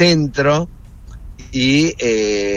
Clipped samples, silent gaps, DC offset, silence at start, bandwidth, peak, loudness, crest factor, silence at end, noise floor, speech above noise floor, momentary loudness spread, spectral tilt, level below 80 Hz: under 0.1%; none; under 0.1%; 0 s; 10.5 kHz; -2 dBFS; -16 LUFS; 16 dB; 0 s; -36 dBFS; 21 dB; 13 LU; -5 dB/octave; -38 dBFS